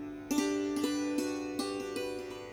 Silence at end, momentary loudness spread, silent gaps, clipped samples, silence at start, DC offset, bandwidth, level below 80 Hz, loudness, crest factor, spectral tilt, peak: 0 s; 6 LU; none; under 0.1%; 0 s; under 0.1%; 19 kHz; -64 dBFS; -34 LUFS; 16 dB; -3.5 dB/octave; -18 dBFS